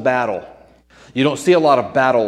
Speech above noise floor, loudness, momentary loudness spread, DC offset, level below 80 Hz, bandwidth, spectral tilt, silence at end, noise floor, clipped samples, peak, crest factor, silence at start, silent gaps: 32 dB; -16 LUFS; 13 LU; under 0.1%; -56 dBFS; 12.5 kHz; -5.5 dB/octave; 0 s; -47 dBFS; under 0.1%; 0 dBFS; 16 dB; 0 s; none